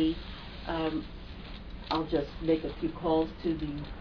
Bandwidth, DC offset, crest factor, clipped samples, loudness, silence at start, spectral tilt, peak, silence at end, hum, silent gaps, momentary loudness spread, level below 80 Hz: 5.4 kHz; under 0.1%; 16 dB; under 0.1%; -32 LUFS; 0 s; -5 dB/octave; -16 dBFS; 0 s; none; none; 15 LU; -44 dBFS